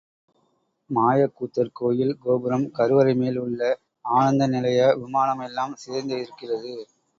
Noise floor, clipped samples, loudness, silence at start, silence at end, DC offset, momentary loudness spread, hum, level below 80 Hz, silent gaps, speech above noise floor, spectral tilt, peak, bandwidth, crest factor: -69 dBFS; under 0.1%; -23 LUFS; 0.9 s; 0.35 s; under 0.1%; 11 LU; none; -66 dBFS; none; 47 dB; -7 dB/octave; -6 dBFS; 7.8 kHz; 18 dB